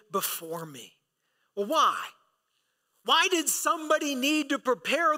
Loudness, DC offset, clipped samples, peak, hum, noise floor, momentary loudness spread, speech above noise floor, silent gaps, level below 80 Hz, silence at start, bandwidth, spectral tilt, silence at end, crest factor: -26 LUFS; under 0.1%; under 0.1%; -12 dBFS; none; -76 dBFS; 17 LU; 49 dB; none; -82 dBFS; 0.15 s; 16 kHz; -1.5 dB/octave; 0 s; 16 dB